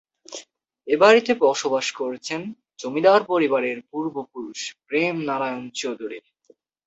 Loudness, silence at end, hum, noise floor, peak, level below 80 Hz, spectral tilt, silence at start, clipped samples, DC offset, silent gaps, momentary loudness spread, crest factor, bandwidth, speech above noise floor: -22 LUFS; 0.65 s; none; -59 dBFS; -2 dBFS; -70 dBFS; -3.5 dB/octave; 0.3 s; under 0.1%; under 0.1%; none; 21 LU; 20 dB; 8.2 kHz; 37 dB